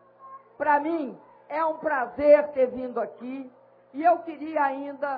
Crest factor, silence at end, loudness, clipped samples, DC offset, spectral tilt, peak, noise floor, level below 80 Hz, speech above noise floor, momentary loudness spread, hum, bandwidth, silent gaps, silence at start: 20 dB; 0 s; -25 LUFS; under 0.1%; under 0.1%; -8.5 dB/octave; -6 dBFS; -48 dBFS; -66 dBFS; 23 dB; 18 LU; 60 Hz at -65 dBFS; 5 kHz; none; 0.2 s